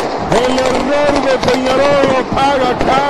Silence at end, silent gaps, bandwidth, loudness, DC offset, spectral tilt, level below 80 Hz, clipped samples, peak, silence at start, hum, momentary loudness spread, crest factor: 0 s; none; 12.5 kHz; -12 LUFS; under 0.1%; -4.5 dB/octave; -32 dBFS; under 0.1%; 0 dBFS; 0 s; none; 3 LU; 12 dB